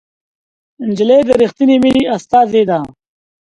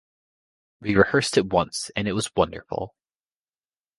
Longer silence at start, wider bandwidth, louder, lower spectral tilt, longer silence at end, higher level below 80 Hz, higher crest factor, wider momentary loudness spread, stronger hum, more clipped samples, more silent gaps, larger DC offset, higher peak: about the same, 0.8 s vs 0.8 s; about the same, 11 kHz vs 11.5 kHz; first, -12 LUFS vs -23 LUFS; first, -6.5 dB/octave vs -4.5 dB/octave; second, 0.55 s vs 1.1 s; about the same, -48 dBFS vs -50 dBFS; second, 14 dB vs 24 dB; about the same, 11 LU vs 13 LU; neither; neither; neither; neither; about the same, 0 dBFS vs -2 dBFS